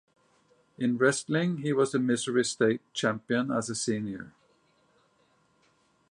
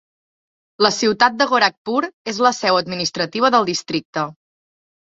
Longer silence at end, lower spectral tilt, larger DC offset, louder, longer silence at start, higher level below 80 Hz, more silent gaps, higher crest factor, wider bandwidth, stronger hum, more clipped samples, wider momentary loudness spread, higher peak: first, 1.8 s vs 0.8 s; first, -4.5 dB/octave vs -3 dB/octave; neither; second, -28 LUFS vs -18 LUFS; about the same, 0.8 s vs 0.8 s; second, -72 dBFS vs -62 dBFS; second, none vs 1.77-1.85 s, 2.13-2.25 s, 4.05-4.13 s; about the same, 18 dB vs 18 dB; first, 11 kHz vs 8 kHz; neither; neither; about the same, 7 LU vs 9 LU; second, -12 dBFS vs -2 dBFS